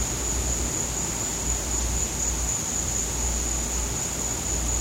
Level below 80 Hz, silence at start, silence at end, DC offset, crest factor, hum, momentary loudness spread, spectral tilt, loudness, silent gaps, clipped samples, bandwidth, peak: -32 dBFS; 0 s; 0 s; under 0.1%; 14 dB; none; 1 LU; -2.5 dB/octave; -25 LUFS; none; under 0.1%; 16 kHz; -12 dBFS